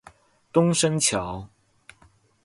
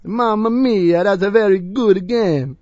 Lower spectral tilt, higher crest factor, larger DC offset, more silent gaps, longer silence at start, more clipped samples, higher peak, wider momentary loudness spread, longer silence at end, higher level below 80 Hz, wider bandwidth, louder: second, -4 dB/octave vs -7.5 dB/octave; about the same, 18 dB vs 16 dB; neither; neither; first, 0.55 s vs 0.05 s; neither; second, -8 dBFS vs 0 dBFS; first, 14 LU vs 3 LU; first, 1 s vs 0.05 s; about the same, -54 dBFS vs -50 dBFS; first, 11.5 kHz vs 7.8 kHz; second, -22 LUFS vs -16 LUFS